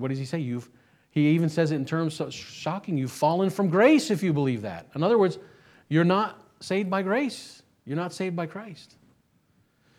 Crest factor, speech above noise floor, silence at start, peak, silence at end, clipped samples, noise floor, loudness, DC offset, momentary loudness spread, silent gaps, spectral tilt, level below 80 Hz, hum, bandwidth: 20 dB; 41 dB; 0 s; -6 dBFS; 1.15 s; under 0.1%; -66 dBFS; -26 LUFS; under 0.1%; 13 LU; none; -6.5 dB/octave; -72 dBFS; none; 15 kHz